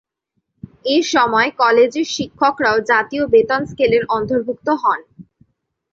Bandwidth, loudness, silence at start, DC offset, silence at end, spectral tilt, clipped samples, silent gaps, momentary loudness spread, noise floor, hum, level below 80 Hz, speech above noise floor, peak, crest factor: 7.6 kHz; -16 LUFS; 0.85 s; under 0.1%; 0.7 s; -4 dB/octave; under 0.1%; none; 7 LU; -72 dBFS; none; -52 dBFS; 56 dB; -2 dBFS; 14 dB